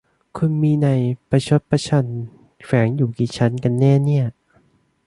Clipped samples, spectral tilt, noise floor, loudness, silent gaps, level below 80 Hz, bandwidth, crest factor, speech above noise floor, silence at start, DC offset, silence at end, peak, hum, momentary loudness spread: under 0.1%; -7.5 dB/octave; -59 dBFS; -19 LUFS; none; -52 dBFS; 11 kHz; 18 dB; 41 dB; 0.35 s; under 0.1%; 0.75 s; -2 dBFS; none; 11 LU